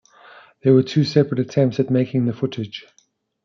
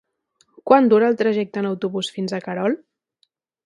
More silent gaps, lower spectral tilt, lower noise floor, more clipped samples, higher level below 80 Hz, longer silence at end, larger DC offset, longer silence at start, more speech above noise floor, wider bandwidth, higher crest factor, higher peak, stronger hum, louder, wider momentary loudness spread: neither; first, -8 dB/octave vs -6 dB/octave; second, -47 dBFS vs -68 dBFS; neither; about the same, -66 dBFS vs -70 dBFS; second, 0.65 s vs 0.9 s; neither; about the same, 0.65 s vs 0.65 s; second, 29 dB vs 49 dB; second, 7.4 kHz vs 11.5 kHz; about the same, 16 dB vs 20 dB; second, -4 dBFS vs 0 dBFS; neither; about the same, -19 LUFS vs -20 LUFS; about the same, 12 LU vs 12 LU